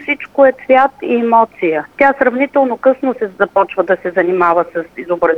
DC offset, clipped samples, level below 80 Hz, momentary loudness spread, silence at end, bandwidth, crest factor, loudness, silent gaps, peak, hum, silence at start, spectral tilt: under 0.1%; under 0.1%; -54 dBFS; 6 LU; 0 s; 4.8 kHz; 12 dB; -13 LUFS; none; 0 dBFS; none; 0 s; -7 dB/octave